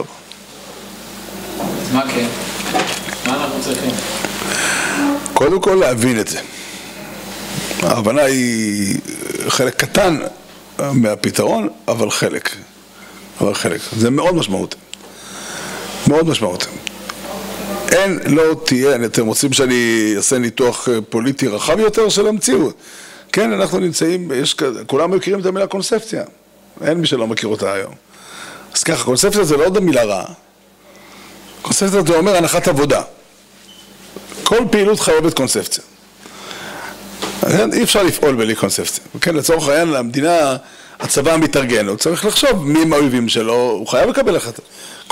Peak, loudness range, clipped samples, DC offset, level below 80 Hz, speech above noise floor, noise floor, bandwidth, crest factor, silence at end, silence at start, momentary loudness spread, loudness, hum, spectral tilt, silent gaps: 0 dBFS; 5 LU; under 0.1%; under 0.1%; -44 dBFS; 30 dB; -46 dBFS; 16.5 kHz; 16 dB; 0.1 s; 0 s; 17 LU; -16 LUFS; none; -4 dB/octave; none